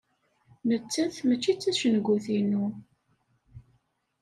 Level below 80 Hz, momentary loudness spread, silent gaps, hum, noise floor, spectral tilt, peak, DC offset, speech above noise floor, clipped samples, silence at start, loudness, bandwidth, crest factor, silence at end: -68 dBFS; 7 LU; none; none; -71 dBFS; -5 dB/octave; -12 dBFS; under 0.1%; 45 dB; under 0.1%; 0.65 s; -27 LUFS; 12.5 kHz; 16 dB; 0.6 s